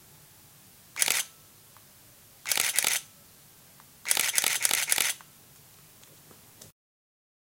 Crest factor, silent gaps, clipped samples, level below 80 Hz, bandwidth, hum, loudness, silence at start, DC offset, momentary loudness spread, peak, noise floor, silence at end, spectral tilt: 32 dB; none; under 0.1%; -74 dBFS; 17 kHz; none; -26 LUFS; 0.95 s; under 0.1%; 15 LU; 0 dBFS; -55 dBFS; 0.75 s; 2 dB/octave